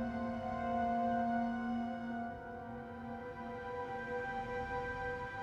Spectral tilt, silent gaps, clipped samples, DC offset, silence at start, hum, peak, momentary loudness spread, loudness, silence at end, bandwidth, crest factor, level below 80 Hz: -7.5 dB/octave; none; under 0.1%; under 0.1%; 0 s; none; -24 dBFS; 11 LU; -40 LUFS; 0 s; 7.8 kHz; 14 dB; -58 dBFS